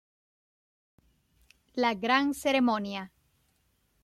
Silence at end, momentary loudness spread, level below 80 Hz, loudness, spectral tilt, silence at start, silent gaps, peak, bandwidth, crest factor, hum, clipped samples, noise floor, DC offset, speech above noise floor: 0.95 s; 14 LU; -68 dBFS; -28 LUFS; -4 dB/octave; 1.75 s; none; -12 dBFS; 14.5 kHz; 20 dB; none; under 0.1%; -72 dBFS; under 0.1%; 44 dB